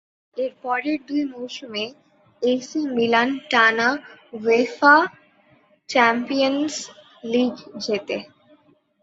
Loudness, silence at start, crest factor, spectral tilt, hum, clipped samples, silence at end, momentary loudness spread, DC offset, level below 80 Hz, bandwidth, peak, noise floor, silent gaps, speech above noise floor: -21 LUFS; 0.35 s; 20 dB; -3.5 dB/octave; none; under 0.1%; 0.8 s; 15 LU; under 0.1%; -70 dBFS; 8 kHz; -2 dBFS; -58 dBFS; none; 37 dB